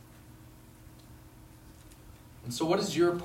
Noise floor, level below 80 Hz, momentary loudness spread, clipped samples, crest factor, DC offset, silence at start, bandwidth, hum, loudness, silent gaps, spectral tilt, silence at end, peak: -53 dBFS; -58 dBFS; 26 LU; under 0.1%; 18 dB; under 0.1%; 0.15 s; 16 kHz; none; -30 LUFS; none; -5 dB/octave; 0 s; -16 dBFS